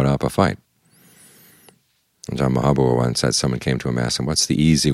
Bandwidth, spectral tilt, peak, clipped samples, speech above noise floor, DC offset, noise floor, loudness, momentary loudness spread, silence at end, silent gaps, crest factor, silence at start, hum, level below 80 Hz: 15 kHz; -5 dB/octave; -2 dBFS; under 0.1%; 45 dB; under 0.1%; -64 dBFS; -19 LUFS; 6 LU; 0 s; none; 18 dB; 0 s; none; -40 dBFS